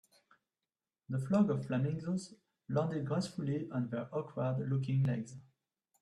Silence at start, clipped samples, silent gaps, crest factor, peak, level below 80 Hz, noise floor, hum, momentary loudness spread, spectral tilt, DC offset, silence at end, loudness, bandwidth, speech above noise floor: 1.1 s; under 0.1%; none; 18 dB; -18 dBFS; -72 dBFS; under -90 dBFS; none; 9 LU; -8 dB/octave; under 0.1%; 0.6 s; -36 LUFS; 11 kHz; over 55 dB